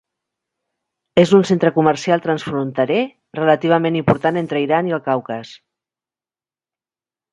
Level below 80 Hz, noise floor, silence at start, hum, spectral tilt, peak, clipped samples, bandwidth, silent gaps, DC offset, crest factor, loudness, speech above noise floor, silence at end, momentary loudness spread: -56 dBFS; under -90 dBFS; 1.15 s; none; -6.5 dB/octave; 0 dBFS; under 0.1%; 11 kHz; none; under 0.1%; 18 dB; -17 LUFS; over 73 dB; 1.75 s; 9 LU